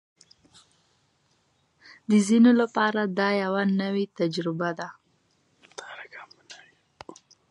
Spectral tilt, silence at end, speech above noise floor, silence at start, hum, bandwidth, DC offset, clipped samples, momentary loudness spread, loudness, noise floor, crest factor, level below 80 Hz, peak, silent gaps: -6 dB/octave; 0.95 s; 45 dB; 2.1 s; none; 11 kHz; under 0.1%; under 0.1%; 27 LU; -24 LUFS; -68 dBFS; 18 dB; -76 dBFS; -10 dBFS; none